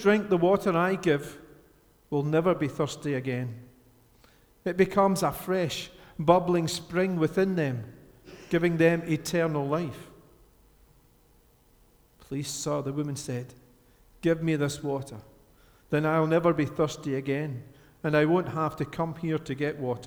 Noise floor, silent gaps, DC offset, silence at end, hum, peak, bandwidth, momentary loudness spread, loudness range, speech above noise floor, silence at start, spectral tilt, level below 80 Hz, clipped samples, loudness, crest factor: -61 dBFS; none; under 0.1%; 0 s; none; -4 dBFS; over 20 kHz; 13 LU; 9 LU; 34 dB; 0 s; -6 dB/octave; -58 dBFS; under 0.1%; -27 LUFS; 24 dB